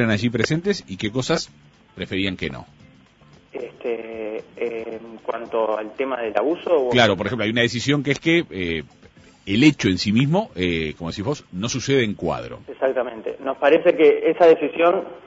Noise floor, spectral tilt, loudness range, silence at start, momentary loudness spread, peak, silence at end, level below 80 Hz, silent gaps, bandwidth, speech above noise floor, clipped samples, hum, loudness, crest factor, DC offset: -52 dBFS; -5.5 dB/octave; 10 LU; 0 s; 14 LU; -2 dBFS; 0.1 s; -52 dBFS; none; 8 kHz; 31 dB; under 0.1%; none; -21 LUFS; 20 dB; under 0.1%